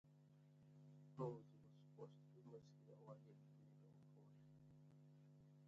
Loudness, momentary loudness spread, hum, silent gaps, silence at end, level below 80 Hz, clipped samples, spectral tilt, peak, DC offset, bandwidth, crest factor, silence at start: -62 LUFS; 16 LU; 50 Hz at -70 dBFS; none; 0 s; under -90 dBFS; under 0.1%; -9 dB/octave; -36 dBFS; under 0.1%; 7.4 kHz; 24 dB; 0.05 s